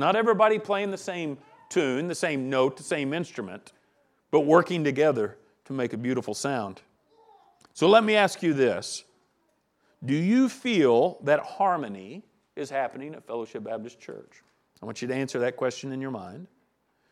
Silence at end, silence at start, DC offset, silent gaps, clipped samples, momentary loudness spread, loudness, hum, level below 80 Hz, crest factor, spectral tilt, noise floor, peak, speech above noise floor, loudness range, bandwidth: 0.65 s; 0 s; under 0.1%; none; under 0.1%; 20 LU; -26 LUFS; none; -78 dBFS; 22 dB; -5 dB/octave; -71 dBFS; -4 dBFS; 45 dB; 8 LU; 13.5 kHz